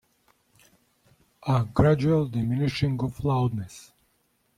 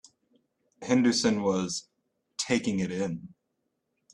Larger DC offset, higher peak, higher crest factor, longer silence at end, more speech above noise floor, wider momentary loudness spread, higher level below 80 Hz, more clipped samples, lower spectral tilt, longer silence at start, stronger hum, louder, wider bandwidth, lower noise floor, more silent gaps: neither; first, -4 dBFS vs -10 dBFS; about the same, 22 dB vs 20 dB; about the same, 0.75 s vs 0.85 s; second, 45 dB vs 53 dB; about the same, 14 LU vs 15 LU; first, -48 dBFS vs -66 dBFS; neither; first, -8 dB/octave vs -4.5 dB/octave; first, 1.45 s vs 0.8 s; neither; first, -25 LUFS vs -28 LUFS; first, 13.5 kHz vs 11.5 kHz; second, -69 dBFS vs -79 dBFS; neither